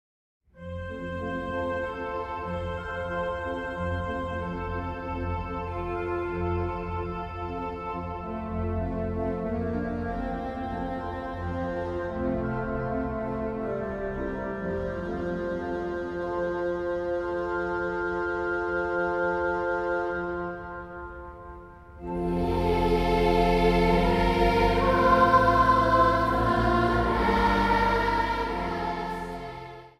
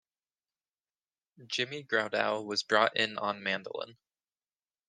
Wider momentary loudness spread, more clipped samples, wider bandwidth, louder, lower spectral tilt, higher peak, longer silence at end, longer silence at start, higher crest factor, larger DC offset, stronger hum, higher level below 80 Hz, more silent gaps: about the same, 12 LU vs 12 LU; neither; first, 14.5 kHz vs 10 kHz; first, -27 LUFS vs -31 LUFS; first, -7 dB/octave vs -3 dB/octave; about the same, -8 dBFS vs -8 dBFS; second, 0.1 s vs 0.95 s; second, 0.55 s vs 1.4 s; second, 20 dB vs 26 dB; neither; neither; first, -38 dBFS vs -82 dBFS; neither